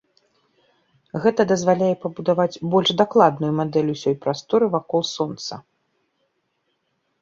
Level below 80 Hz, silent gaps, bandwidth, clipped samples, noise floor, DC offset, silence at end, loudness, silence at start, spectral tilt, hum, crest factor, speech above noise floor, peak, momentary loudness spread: -64 dBFS; none; 7.6 kHz; under 0.1%; -72 dBFS; under 0.1%; 1.6 s; -20 LUFS; 1.15 s; -5.5 dB/octave; none; 20 dB; 52 dB; -2 dBFS; 9 LU